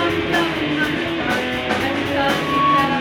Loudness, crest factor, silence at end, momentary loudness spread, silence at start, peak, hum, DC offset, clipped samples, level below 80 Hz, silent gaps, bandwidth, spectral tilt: -19 LUFS; 14 dB; 0 s; 4 LU; 0 s; -6 dBFS; none; under 0.1%; under 0.1%; -44 dBFS; none; 18.5 kHz; -5 dB/octave